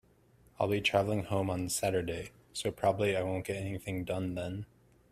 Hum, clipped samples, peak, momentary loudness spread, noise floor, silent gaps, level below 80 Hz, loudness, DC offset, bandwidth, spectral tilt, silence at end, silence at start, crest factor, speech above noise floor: none; under 0.1%; -12 dBFS; 11 LU; -64 dBFS; none; -60 dBFS; -33 LUFS; under 0.1%; 15 kHz; -5 dB/octave; 0.45 s; 0.6 s; 22 dB; 31 dB